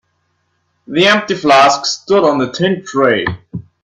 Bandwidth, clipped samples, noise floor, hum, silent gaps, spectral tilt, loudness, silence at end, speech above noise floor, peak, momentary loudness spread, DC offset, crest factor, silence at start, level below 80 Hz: 11.5 kHz; under 0.1%; -64 dBFS; none; none; -4 dB/octave; -12 LUFS; 0.2 s; 51 dB; 0 dBFS; 12 LU; under 0.1%; 14 dB; 0.9 s; -50 dBFS